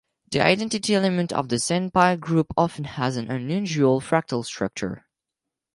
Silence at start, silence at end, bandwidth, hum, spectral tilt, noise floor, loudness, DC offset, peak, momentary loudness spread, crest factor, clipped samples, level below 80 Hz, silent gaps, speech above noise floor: 0.3 s; 0.75 s; 11.5 kHz; none; -5 dB/octave; -85 dBFS; -23 LUFS; under 0.1%; -4 dBFS; 9 LU; 20 dB; under 0.1%; -56 dBFS; none; 63 dB